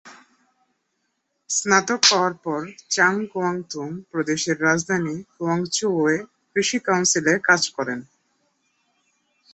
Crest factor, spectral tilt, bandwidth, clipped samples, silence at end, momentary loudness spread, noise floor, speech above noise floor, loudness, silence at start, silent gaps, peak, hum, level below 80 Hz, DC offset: 22 dB; -2.5 dB/octave; 8.6 kHz; under 0.1%; 1.5 s; 12 LU; -74 dBFS; 52 dB; -21 LUFS; 0.05 s; none; -2 dBFS; none; -66 dBFS; under 0.1%